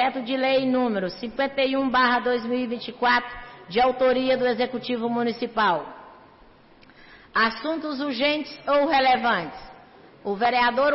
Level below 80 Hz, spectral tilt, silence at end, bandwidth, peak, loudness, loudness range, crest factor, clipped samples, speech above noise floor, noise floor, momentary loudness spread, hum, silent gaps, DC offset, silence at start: -56 dBFS; -8 dB/octave; 0 s; 5.8 kHz; -10 dBFS; -23 LUFS; 4 LU; 12 dB; under 0.1%; 29 dB; -52 dBFS; 9 LU; none; none; under 0.1%; 0 s